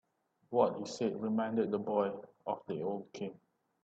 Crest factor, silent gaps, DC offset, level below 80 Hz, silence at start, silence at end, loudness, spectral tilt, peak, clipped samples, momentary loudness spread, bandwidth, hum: 22 dB; none; under 0.1%; -80 dBFS; 0.5 s; 0.5 s; -36 LUFS; -6.5 dB/octave; -14 dBFS; under 0.1%; 12 LU; 8.2 kHz; none